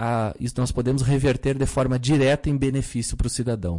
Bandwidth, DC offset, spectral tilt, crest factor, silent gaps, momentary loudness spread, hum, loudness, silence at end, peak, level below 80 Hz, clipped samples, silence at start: 11.5 kHz; under 0.1%; -6 dB/octave; 10 dB; none; 6 LU; none; -23 LUFS; 0 s; -12 dBFS; -34 dBFS; under 0.1%; 0 s